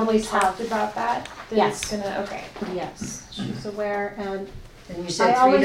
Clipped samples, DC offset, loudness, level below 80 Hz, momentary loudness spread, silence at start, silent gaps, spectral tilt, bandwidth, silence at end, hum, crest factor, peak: under 0.1%; under 0.1%; -25 LUFS; -48 dBFS; 13 LU; 0 s; none; -4.5 dB/octave; 16 kHz; 0 s; none; 18 dB; -6 dBFS